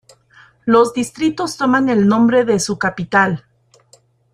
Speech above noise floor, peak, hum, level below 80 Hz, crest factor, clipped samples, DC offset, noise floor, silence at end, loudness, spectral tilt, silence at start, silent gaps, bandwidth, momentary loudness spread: 38 dB; -2 dBFS; none; -54 dBFS; 16 dB; under 0.1%; under 0.1%; -53 dBFS; 0.95 s; -16 LUFS; -5 dB/octave; 0.65 s; none; 14.5 kHz; 6 LU